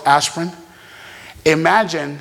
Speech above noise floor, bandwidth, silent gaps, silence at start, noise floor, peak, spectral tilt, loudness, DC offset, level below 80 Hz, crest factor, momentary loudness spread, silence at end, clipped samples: 24 dB; 17 kHz; none; 0 s; -40 dBFS; 0 dBFS; -3.5 dB/octave; -17 LUFS; under 0.1%; -54 dBFS; 18 dB; 23 LU; 0 s; under 0.1%